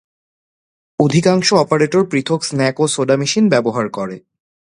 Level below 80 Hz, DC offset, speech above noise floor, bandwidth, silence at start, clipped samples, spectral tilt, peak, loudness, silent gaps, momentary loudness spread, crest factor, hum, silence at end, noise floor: -56 dBFS; under 0.1%; over 75 dB; 11.5 kHz; 1 s; under 0.1%; -5 dB/octave; 0 dBFS; -15 LUFS; none; 11 LU; 16 dB; none; 0.5 s; under -90 dBFS